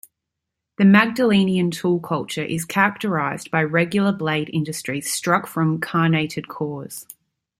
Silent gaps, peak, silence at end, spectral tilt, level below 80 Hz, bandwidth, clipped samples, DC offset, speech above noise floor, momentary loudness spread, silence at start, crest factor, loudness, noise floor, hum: none; -2 dBFS; 0.55 s; -5.5 dB/octave; -62 dBFS; 15.5 kHz; under 0.1%; under 0.1%; 62 dB; 12 LU; 0.8 s; 20 dB; -20 LUFS; -82 dBFS; none